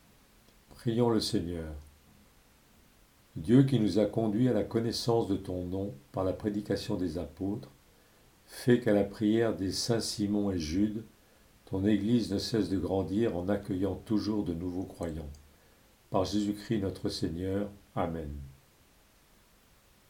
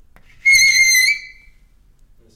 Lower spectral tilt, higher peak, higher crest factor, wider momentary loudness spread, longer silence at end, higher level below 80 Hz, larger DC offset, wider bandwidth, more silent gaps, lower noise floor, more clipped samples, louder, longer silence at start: first, -6.5 dB/octave vs 4.5 dB/octave; second, -10 dBFS vs -4 dBFS; first, 22 dB vs 12 dB; about the same, 11 LU vs 9 LU; first, 1.6 s vs 1.1 s; second, -54 dBFS vs -48 dBFS; neither; about the same, 17 kHz vs 16 kHz; neither; first, -63 dBFS vs -50 dBFS; neither; second, -31 LUFS vs -11 LUFS; first, 0.75 s vs 0.45 s